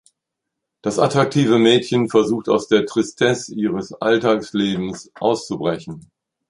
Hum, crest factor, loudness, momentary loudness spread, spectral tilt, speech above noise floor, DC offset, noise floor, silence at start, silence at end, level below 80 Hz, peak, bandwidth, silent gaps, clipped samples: none; 18 dB; -19 LUFS; 10 LU; -5.5 dB/octave; 63 dB; under 0.1%; -81 dBFS; 0.85 s; 0.5 s; -58 dBFS; -2 dBFS; 11.5 kHz; none; under 0.1%